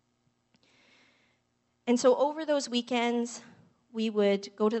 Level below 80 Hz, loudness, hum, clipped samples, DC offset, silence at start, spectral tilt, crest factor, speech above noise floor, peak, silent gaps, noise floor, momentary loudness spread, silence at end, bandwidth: -86 dBFS; -29 LUFS; none; under 0.1%; under 0.1%; 1.85 s; -4 dB/octave; 20 dB; 47 dB; -10 dBFS; none; -75 dBFS; 13 LU; 0 s; 8.2 kHz